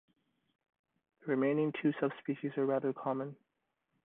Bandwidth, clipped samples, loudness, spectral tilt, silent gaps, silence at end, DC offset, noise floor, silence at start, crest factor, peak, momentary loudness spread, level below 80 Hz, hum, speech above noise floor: 3.9 kHz; under 0.1%; -35 LUFS; -10.5 dB/octave; none; 0.7 s; under 0.1%; -84 dBFS; 1.25 s; 18 dB; -18 dBFS; 8 LU; -84 dBFS; none; 50 dB